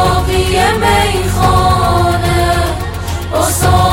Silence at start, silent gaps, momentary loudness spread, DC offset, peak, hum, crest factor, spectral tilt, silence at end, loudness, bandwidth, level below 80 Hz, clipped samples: 0 s; none; 7 LU; under 0.1%; 0 dBFS; none; 12 dB; -4.5 dB/octave; 0 s; -12 LUFS; 17 kHz; -22 dBFS; under 0.1%